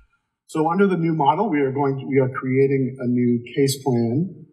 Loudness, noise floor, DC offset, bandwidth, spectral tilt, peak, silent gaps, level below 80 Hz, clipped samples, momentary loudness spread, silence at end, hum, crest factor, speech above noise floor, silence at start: -21 LUFS; -59 dBFS; under 0.1%; 15.5 kHz; -7 dB/octave; -4 dBFS; none; -70 dBFS; under 0.1%; 4 LU; 0.1 s; none; 16 dB; 39 dB; 0.5 s